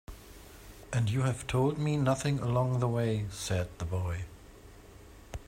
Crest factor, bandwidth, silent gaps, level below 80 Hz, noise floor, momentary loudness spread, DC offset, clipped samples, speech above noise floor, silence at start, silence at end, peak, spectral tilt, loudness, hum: 18 dB; 16 kHz; none; -52 dBFS; -52 dBFS; 21 LU; under 0.1%; under 0.1%; 22 dB; 0.1 s; 0.05 s; -14 dBFS; -6.5 dB/octave; -31 LUFS; none